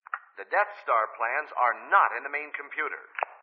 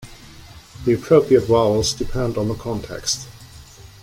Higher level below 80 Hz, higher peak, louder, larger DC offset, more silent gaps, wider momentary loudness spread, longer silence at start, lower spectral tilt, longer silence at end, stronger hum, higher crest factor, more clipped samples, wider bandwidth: second, under -90 dBFS vs -40 dBFS; second, -8 dBFS vs -2 dBFS; second, -27 LUFS vs -19 LUFS; neither; neither; about the same, 12 LU vs 12 LU; first, 0.15 s vs 0 s; second, 3.5 dB/octave vs -5 dB/octave; about the same, 0.05 s vs 0.15 s; neither; about the same, 22 dB vs 18 dB; neither; second, 5.2 kHz vs 16.5 kHz